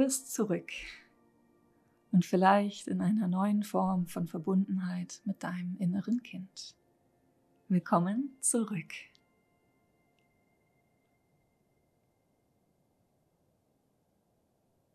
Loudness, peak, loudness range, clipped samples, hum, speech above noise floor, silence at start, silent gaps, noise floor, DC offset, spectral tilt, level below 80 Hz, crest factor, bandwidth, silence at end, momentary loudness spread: -32 LUFS; -12 dBFS; 7 LU; under 0.1%; none; 43 dB; 0 s; none; -74 dBFS; under 0.1%; -5.5 dB/octave; -74 dBFS; 22 dB; 13.5 kHz; 5.9 s; 16 LU